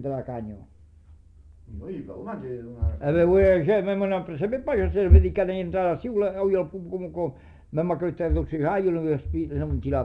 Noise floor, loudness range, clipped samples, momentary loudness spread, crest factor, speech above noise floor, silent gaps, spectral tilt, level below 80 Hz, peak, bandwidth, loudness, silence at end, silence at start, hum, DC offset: -51 dBFS; 5 LU; under 0.1%; 18 LU; 20 dB; 27 dB; none; -10.5 dB/octave; -30 dBFS; -4 dBFS; 4 kHz; -24 LUFS; 0 s; 0 s; none; under 0.1%